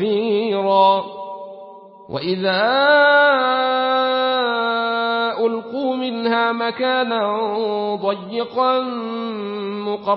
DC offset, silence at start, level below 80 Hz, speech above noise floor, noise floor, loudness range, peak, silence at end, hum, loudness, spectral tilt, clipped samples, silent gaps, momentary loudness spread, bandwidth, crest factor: under 0.1%; 0 s; -68 dBFS; 22 dB; -40 dBFS; 5 LU; -4 dBFS; 0 s; none; -18 LUFS; -9.5 dB/octave; under 0.1%; none; 12 LU; 5.8 kHz; 16 dB